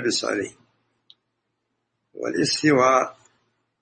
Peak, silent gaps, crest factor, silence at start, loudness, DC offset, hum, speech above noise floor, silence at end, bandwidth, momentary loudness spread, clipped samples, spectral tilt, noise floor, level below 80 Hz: -4 dBFS; none; 20 dB; 0 s; -21 LUFS; under 0.1%; none; 55 dB; 0.7 s; 8.8 kHz; 14 LU; under 0.1%; -3.5 dB/octave; -77 dBFS; -66 dBFS